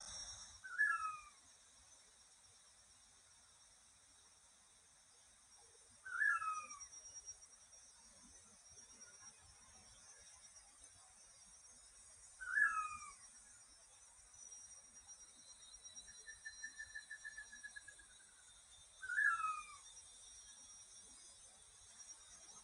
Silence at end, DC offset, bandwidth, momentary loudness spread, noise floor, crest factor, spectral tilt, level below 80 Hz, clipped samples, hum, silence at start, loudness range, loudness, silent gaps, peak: 0 s; under 0.1%; 14.5 kHz; 27 LU; -69 dBFS; 26 dB; 1.5 dB/octave; -78 dBFS; under 0.1%; none; 0 s; 17 LU; -44 LUFS; none; -24 dBFS